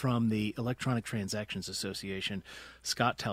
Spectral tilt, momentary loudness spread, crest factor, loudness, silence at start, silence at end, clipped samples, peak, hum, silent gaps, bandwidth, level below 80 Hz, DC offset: -4.5 dB/octave; 7 LU; 22 dB; -34 LUFS; 0 s; 0 s; under 0.1%; -12 dBFS; none; none; 16 kHz; -62 dBFS; under 0.1%